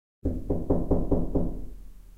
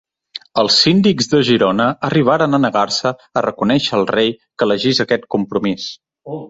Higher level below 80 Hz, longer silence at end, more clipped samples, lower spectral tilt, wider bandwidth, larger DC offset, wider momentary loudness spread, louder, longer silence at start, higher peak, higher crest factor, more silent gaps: first, -34 dBFS vs -52 dBFS; first, 0.15 s vs 0 s; neither; first, -11.5 dB/octave vs -5 dB/octave; second, 1.9 kHz vs 8 kHz; neither; about the same, 11 LU vs 10 LU; second, -29 LUFS vs -15 LUFS; about the same, 0.25 s vs 0.35 s; second, -12 dBFS vs -2 dBFS; about the same, 16 dB vs 14 dB; neither